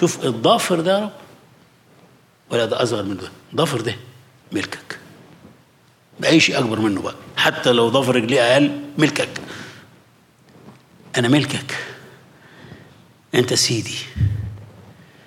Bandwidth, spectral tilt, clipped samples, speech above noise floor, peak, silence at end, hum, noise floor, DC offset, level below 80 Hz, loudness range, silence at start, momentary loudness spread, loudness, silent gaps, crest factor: 16.5 kHz; -4.5 dB/octave; under 0.1%; 36 dB; -2 dBFS; 0.45 s; none; -54 dBFS; under 0.1%; -50 dBFS; 8 LU; 0 s; 17 LU; -19 LUFS; none; 18 dB